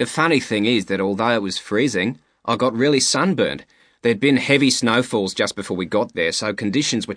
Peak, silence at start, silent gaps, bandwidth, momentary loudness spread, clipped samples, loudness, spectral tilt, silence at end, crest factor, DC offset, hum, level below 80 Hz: 0 dBFS; 0 s; none; 10.5 kHz; 7 LU; under 0.1%; -19 LUFS; -4 dB/octave; 0 s; 18 dB; under 0.1%; none; -60 dBFS